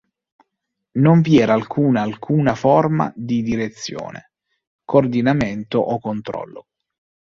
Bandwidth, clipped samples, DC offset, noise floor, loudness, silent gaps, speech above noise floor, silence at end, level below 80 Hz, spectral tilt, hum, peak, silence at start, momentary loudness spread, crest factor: 7.4 kHz; under 0.1%; under 0.1%; -78 dBFS; -18 LUFS; 4.67-4.79 s; 61 dB; 0.7 s; -50 dBFS; -7.5 dB/octave; none; -2 dBFS; 0.95 s; 14 LU; 18 dB